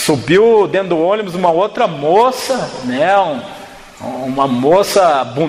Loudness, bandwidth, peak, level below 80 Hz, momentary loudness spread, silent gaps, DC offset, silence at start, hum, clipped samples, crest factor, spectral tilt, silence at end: -13 LUFS; 16 kHz; -2 dBFS; -50 dBFS; 13 LU; none; under 0.1%; 0 s; none; under 0.1%; 12 dB; -5 dB/octave; 0 s